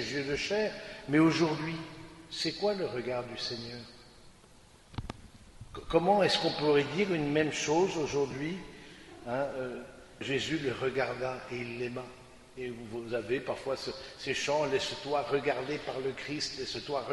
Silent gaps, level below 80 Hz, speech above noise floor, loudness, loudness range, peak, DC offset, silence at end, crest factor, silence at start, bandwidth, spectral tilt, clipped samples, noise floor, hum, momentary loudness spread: none; -58 dBFS; 26 dB; -32 LUFS; 8 LU; -12 dBFS; under 0.1%; 0 s; 22 dB; 0 s; 11.5 kHz; -4.5 dB/octave; under 0.1%; -57 dBFS; none; 18 LU